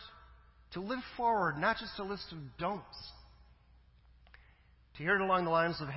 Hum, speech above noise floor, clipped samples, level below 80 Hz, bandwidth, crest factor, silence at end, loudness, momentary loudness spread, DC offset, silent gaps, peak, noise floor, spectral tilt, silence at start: none; 29 dB; under 0.1%; -60 dBFS; 5.8 kHz; 20 dB; 0 s; -34 LUFS; 18 LU; under 0.1%; none; -18 dBFS; -64 dBFS; -8.5 dB/octave; 0 s